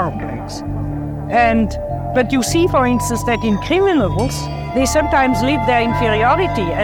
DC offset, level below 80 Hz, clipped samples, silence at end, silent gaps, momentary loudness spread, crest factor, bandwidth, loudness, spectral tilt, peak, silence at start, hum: under 0.1%; -30 dBFS; under 0.1%; 0 s; none; 10 LU; 14 dB; 18.5 kHz; -16 LUFS; -5.5 dB/octave; -2 dBFS; 0 s; none